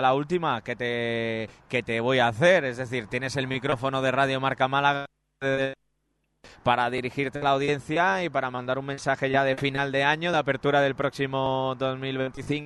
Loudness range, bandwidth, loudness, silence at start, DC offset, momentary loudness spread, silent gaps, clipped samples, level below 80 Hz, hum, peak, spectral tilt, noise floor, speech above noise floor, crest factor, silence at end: 2 LU; 12 kHz; -26 LUFS; 0 s; under 0.1%; 7 LU; none; under 0.1%; -58 dBFS; none; -6 dBFS; -5.5 dB/octave; -74 dBFS; 49 dB; 20 dB; 0 s